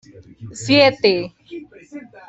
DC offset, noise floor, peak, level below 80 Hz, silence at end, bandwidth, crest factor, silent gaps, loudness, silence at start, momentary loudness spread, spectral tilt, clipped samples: under 0.1%; -38 dBFS; 0 dBFS; -58 dBFS; 0.3 s; 8.2 kHz; 20 dB; none; -15 LUFS; 0.4 s; 25 LU; -4.5 dB/octave; under 0.1%